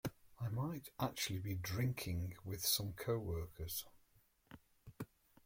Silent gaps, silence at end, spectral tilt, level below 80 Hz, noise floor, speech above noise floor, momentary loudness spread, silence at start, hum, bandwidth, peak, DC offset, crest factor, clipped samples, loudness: none; 0.4 s; -4 dB/octave; -62 dBFS; -73 dBFS; 32 dB; 17 LU; 0.05 s; none; 16.5 kHz; -24 dBFS; under 0.1%; 20 dB; under 0.1%; -42 LUFS